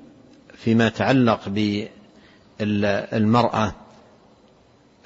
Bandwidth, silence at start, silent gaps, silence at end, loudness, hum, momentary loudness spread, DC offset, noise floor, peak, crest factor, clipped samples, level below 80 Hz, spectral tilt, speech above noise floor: 7.8 kHz; 0.6 s; none; 1.3 s; -21 LUFS; none; 10 LU; under 0.1%; -55 dBFS; -4 dBFS; 18 dB; under 0.1%; -54 dBFS; -7 dB/octave; 35 dB